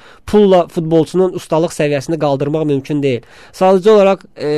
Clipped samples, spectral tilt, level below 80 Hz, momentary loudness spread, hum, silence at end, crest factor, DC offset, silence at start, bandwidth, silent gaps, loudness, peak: under 0.1%; -6.5 dB/octave; -46 dBFS; 7 LU; none; 0 s; 12 dB; 0.5%; 0.25 s; 13 kHz; none; -13 LUFS; -2 dBFS